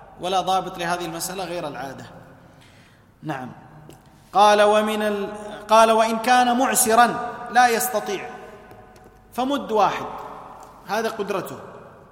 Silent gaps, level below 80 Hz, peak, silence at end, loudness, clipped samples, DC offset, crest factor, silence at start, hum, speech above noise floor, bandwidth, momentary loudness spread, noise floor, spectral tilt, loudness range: none; -58 dBFS; -2 dBFS; 0.2 s; -20 LUFS; under 0.1%; under 0.1%; 20 dB; 0 s; none; 31 dB; 16.5 kHz; 21 LU; -52 dBFS; -3 dB/octave; 11 LU